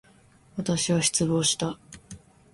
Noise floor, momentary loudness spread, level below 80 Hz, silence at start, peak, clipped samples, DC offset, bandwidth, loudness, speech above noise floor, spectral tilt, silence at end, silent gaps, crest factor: -57 dBFS; 21 LU; -56 dBFS; 0.55 s; -10 dBFS; under 0.1%; under 0.1%; 11.5 kHz; -25 LUFS; 31 dB; -3.5 dB/octave; 0.35 s; none; 18 dB